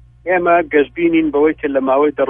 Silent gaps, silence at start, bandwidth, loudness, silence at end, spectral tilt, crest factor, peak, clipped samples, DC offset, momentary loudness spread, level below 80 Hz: none; 0.25 s; 3.7 kHz; -15 LUFS; 0 s; -9.5 dB/octave; 14 dB; 0 dBFS; under 0.1%; under 0.1%; 4 LU; -46 dBFS